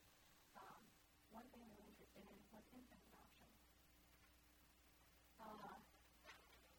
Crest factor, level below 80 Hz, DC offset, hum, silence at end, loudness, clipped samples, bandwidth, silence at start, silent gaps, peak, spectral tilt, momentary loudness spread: 20 dB; -78 dBFS; under 0.1%; none; 0 s; -65 LUFS; under 0.1%; over 20 kHz; 0 s; none; -46 dBFS; -4 dB/octave; 8 LU